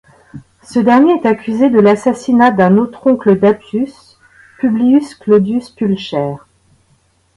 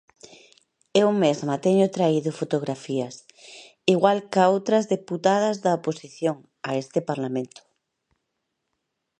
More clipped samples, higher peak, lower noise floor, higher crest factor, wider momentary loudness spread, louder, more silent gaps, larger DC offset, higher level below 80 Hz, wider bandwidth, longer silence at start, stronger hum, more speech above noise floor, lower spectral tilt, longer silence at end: neither; first, 0 dBFS vs -4 dBFS; second, -55 dBFS vs -79 dBFS; second, 12 dB vs 22 dB; about the same, 10 LU vs 11 LU; first, -12 LUFS vs -23 LUFS; neither; neither; first, -52 dBFS vs -74 dBFS; first, 11.5 kHz vs 10 kHz; second, 0.35 s vs 0.95 s; neither; second, 44 dB vs 56 dB; first, -7.5 dB/octave vs -6 dB/octave; second, 1 s vs 1.75 s